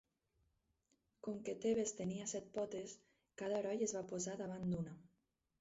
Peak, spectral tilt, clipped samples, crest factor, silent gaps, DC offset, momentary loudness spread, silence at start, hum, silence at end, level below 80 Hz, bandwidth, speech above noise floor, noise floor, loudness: -28 dBFS; -6.5 dB/octave; under 0.1%; 18 dB; none; under 0.1%; 12 LU; 1.25 s; none; 0.55 s; -74 dBFS; 8 kHz; 42 dB; -84 dBFS; -43 LUFS